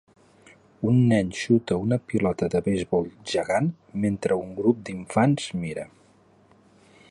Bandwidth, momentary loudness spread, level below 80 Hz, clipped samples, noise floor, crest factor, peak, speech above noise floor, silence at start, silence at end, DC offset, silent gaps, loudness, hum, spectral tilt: 11.5 kHz; 8 LU; -54 dBFS; under 0.1%; -58 dBFS; 18 dB; -8 dBFS; 34 dB; 0.8 s; 1.25 s; under 0.1%; none; -25 LUFS; none; -7 dB/octave